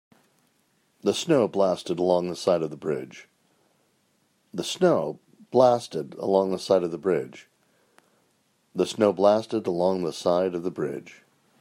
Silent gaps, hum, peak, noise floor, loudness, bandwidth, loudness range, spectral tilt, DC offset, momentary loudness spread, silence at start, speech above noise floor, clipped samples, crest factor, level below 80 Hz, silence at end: none; none; -4 dBFS; -68 dBFS; -25 LUFS; 16 kHz; 4 LU; -5.5 dB/octave; under 0.1%; 13 LU; 1.05 s; 44 dB; under 0.1%; 22 dB; -72 dBFS; 0.5 s